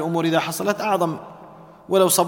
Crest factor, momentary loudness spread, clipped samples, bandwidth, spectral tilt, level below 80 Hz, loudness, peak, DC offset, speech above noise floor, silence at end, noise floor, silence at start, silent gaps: 18 dB; 11 LU; under 0.1%; 19 kHz; -4 dB/octave; -66 dBFS; -21 LUFS; -4 dBFS; under 0.1%; 24 dB; 0 s; -44 dBFS; 0 s; none